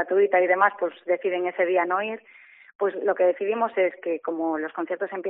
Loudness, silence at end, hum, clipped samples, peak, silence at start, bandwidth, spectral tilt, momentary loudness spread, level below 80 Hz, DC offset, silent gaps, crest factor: -24 LUFS; 0 s; none; under 0.1%; -4 dBFS; 0 s; 3.9 kHz; -2.5 dB/octave; 9 LU; -82 dBFS; under 0.1%; 2.75-2.79 s; 20 dB